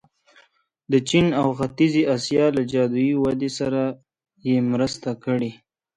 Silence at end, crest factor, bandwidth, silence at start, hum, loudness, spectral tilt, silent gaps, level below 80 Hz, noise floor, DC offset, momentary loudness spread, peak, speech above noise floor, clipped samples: 0.45 s; 16 dB; 10.5 kHz; 0.9 s; none; -22 LUFS; -6 dB/octave; none; -54 dBFS; -61 dBFS; under 0.1%; 8 LU; -6 dBFS; 40 dB; under 0.1%